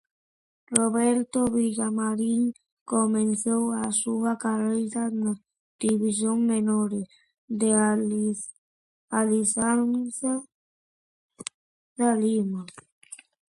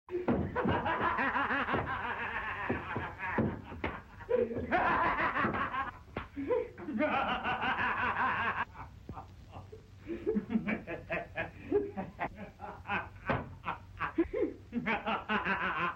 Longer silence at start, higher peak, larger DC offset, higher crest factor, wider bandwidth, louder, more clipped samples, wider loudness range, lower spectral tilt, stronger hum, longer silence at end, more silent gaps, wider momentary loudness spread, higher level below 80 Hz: first, 0.7 s vs 0.1 s; first, 0 dBFS vs -18 dBFS; neither; first, 26 dB vs 16 dB; first, 11.5 kHz vs 8.4 kHz; first, -25 LUFS vs -34 LUFS; neither; about the same, 3 LU vs 5 LU; second, -5 dB/octave vs -7.5 dB/octave; neither; first, 0.35 s vs 0 s; first, 2.72-2.86 s, 5.60-5.79 s, 7.38-7.48 s, 8.58-9.08 s, 10.52-11.29 s, 11.54-11.96 s, 12.92-13.01 s vs none; about the same, 16 LU vs 14 LU; second, -66 dBFS vs -54 dBFS